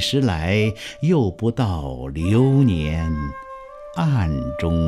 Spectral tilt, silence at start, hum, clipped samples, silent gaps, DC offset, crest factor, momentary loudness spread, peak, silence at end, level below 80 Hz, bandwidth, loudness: -7 dB/octave; 0 s; none; under 0.1%; none; under 0.1%; 14 dB; 13 LU; -6 dBFS; 0 s; -34 dBFS; 13 kHz; -21 LUFS